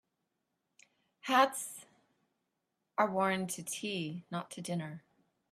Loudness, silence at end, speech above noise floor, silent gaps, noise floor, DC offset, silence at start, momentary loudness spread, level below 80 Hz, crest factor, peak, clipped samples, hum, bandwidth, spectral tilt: -34 LUFS; 0.55 s; 51 dB; none; -85 dBFS; under 0.1%; 1.25 s; 17 LU; -82 dBFS; 24 dB; -12 dBFS; under 0.1%; none; 15.5 kHz; -4 dB/octave